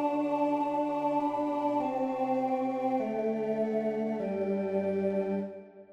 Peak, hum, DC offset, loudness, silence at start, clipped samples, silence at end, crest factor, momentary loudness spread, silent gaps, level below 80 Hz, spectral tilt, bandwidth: -18 dBFS; none; under 0.1%; -31 LUFS; 0 s; under 0.1%; 0 s; 12 dB; 3 LU; none; -76 dBFS; -8.5 dB/octave; 8.6 kHz